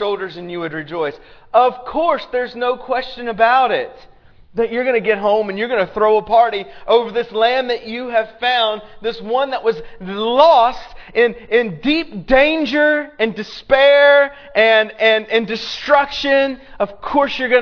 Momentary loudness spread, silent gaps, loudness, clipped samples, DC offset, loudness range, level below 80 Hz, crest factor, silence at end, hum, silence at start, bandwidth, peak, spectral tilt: 12 LU; none; -16 LUFS; under 0.1%; under 0.1%; 5 LU; -44 dBFS; 16 dB; 0 s; none; 0 s; 5.4 kHz; 0 dBFS; -5 dB/octave